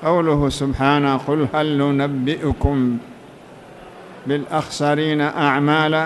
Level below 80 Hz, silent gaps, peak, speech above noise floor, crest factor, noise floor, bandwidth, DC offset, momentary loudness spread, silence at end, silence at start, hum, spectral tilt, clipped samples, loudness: -36 dBFS; none; -4 dBFS; 23 dB; 16 dB; -41 dBFS; 12 kHz; under 0.1%; 8 LU; 0 s; 0 s; none; -6.5 dB/octave; under 0.1%; -19 LUFS